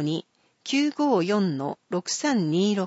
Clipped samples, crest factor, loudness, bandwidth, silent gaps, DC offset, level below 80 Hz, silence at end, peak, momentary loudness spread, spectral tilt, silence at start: under 0.1%; 14 dB; -25 LUFS; 8 kHz; none; under 0.1%; -76 dBFS; 0 s; -12 dBFS; 9 LU; -5 dB/octave; 0 s